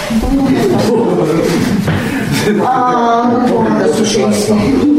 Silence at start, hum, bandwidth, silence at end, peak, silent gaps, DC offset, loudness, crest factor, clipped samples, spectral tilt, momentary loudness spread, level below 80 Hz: 0 s; none; 16 kHz; 0 s; -2 dBFS; none; under 0.1%; -12 LUFS; 10 dB; under 0.1%; -5.5 dB/octave; 3 LU; -30 dBFS